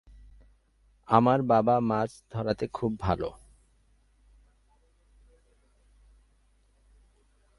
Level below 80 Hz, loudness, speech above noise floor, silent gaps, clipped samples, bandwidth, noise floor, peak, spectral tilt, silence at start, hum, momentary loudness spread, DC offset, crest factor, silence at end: -52 dBFS; -27 LUFS; 39 dB; none; under 0.1%; 11.5 kHz; -65 dBFS; -6 dBFS; -8 dB/octave; 1.1 s; none; 11 LU; under 0.1%; 26 dB; 4.25 s